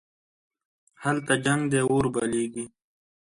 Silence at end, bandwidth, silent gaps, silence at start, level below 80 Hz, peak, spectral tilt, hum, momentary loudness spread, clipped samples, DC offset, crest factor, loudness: 0.65 s; 11.5 kHz; none; 1 s; -58 dBFS; -8 dBFS; -5 dB/octave; none; 10 LU; under 0.1%; under 0.1%; 20 dB; -25 LUFS